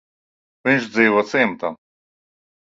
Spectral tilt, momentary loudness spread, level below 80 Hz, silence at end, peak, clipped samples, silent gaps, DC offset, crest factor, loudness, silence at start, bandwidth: -5.5 dB/octave; 11 LU; -64 dBFS; 1.05 s; -2 dBFS; under 0.1%; none; under 0.1%; 20 dB; -19 LUFS; 0.65 s; 7.8 kHz